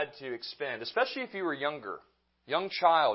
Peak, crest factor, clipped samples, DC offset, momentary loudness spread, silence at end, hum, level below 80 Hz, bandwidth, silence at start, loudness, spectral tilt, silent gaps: -10 dBFS; 22 dB; under 0.1%; under 0.1%; 14 LU; 0 s; none; -80 dBFS; 5.8 kHz; 0 s; -32 LUFS; -7 dB/octave; none